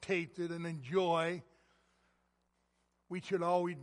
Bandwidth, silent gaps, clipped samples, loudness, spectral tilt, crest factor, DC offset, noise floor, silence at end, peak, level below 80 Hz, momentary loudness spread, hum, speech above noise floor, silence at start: 11.5 kHz; none; under 0.1%; -36 LUFS; -6 dB/octave; 18 dB; under 0.1%; -79 dBFS; 0 s; -20 dBFS; -78 dBFS; 12 LU; none; 43 dB; 0 s